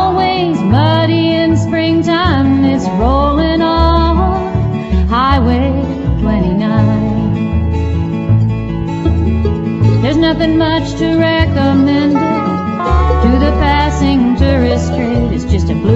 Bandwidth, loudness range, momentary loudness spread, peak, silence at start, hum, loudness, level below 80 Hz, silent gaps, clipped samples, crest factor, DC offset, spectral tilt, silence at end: 8 kHz; 2 LU; 5 LU; 0 dBFS; 0 s; none; -12 LUFS; -20 dBFS; none; under 0.1%; 12 dB; under 0.1%; -7.5 dB/octave; 0 s